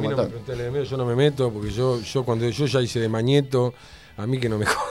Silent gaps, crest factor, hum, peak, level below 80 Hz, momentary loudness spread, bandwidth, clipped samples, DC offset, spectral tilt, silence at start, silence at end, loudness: none; 18 dB; none; -6 dBFS; -48 dBFS; 8 LU; 14.5 kHz; under 0.1%; 0.1%; -6 dB/octave; 0 s; 0 s; -23 LUFS